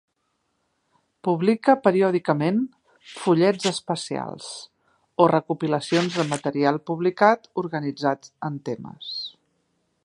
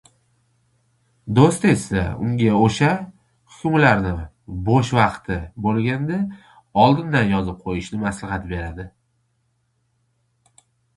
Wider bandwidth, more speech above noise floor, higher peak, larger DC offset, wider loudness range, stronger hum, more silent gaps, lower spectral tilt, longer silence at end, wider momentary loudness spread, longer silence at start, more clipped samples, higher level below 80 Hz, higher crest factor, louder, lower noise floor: about the same, 11.5 kHz vs 11.5 kHz; about the same, 51 dB vs 49 dB; about the same, -2 dBFS vs 0 dBFS; neither; second, 3 LU vs 7 LU; neither; neither; about the same, -5.5 dB/octave vs -6.5 dB/octave; second, 0.75 s vs 2.1 s; about the same, 14 LU vs 13 LU; about the same, 1.25 s vs 1.25 s; neither; second, -72 dBFS vs -40 dBFS; about the same, 22 dB vs 22 dB; second, -23 LUFS vs -20 LUFS; first, -73 dBFS vs -68 dBFS